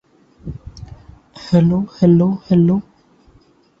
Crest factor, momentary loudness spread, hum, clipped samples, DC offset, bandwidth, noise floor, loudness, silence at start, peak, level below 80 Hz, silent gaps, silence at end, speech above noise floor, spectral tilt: 16 dB; 23 LU; none; under 0.1%; under 0.1%; 7 kHz; -52 dBFS; -15 LUFS; 0.45 s; -2 dBFS; -44 dBFS; none; 1 s; 39 dB; -9.5 dB/octave